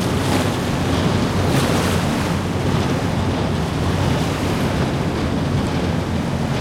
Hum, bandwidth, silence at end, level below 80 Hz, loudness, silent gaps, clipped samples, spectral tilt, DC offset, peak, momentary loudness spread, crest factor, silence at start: none; 16.5 kHz; 0 s; -34 dBFS; -20 LUFS; none; under 0.1%; -6 dB/octave; under 0.1%; -6 dBFS; 3 LU; 14 dB; 0 s